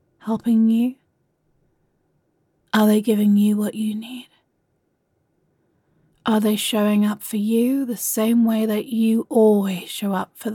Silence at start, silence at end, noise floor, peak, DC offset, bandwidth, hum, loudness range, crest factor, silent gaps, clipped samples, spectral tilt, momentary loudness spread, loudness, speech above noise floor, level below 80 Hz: 0.25 s; 0 s; -69 dBFS; -6 dBFS; under 0.1%; 17.5 kHz; none; 5 LU; 16 dB; none; under 0.1%; -5.5 dB/octave; 9 LU; -20 LUFS; 50 dB; -70 dBFS